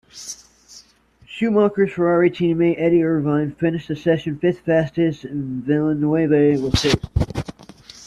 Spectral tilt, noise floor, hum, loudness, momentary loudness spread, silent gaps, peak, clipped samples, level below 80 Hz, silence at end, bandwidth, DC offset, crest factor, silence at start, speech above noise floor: -6.5 dB/octave; -53 dBFS; none; -19 LUFS; 12 LU; none; -4 dBFS; under 0.1%; -38 dBFS; 0 s; 12.5 kHz; under 0.1%; 16 dB; 0.15 s; 34 dB